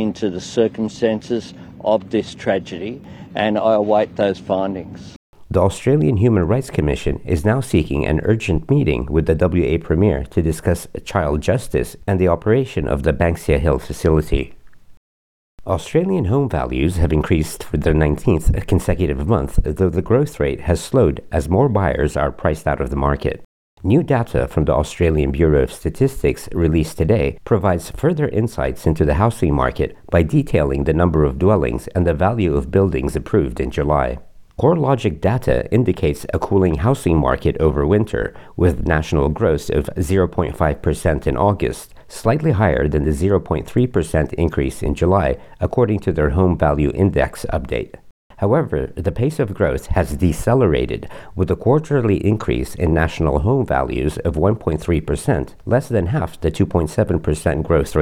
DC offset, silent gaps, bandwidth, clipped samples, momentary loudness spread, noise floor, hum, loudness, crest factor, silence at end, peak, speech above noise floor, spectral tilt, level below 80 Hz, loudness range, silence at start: under 0.1%; 5.16-5.33 s, 14.97-15.58 s, 23.45-23.77 s, 48.11-48.30 s; 15.5 kHz; under 0.1%; 7 LU; under -90 dBFS; none; -18 LUFS; 16 dB; 0 s; -2 dBFS; over 73 dB; -7.5 dB/octave; -30 dBFS; 2 LU; 0 s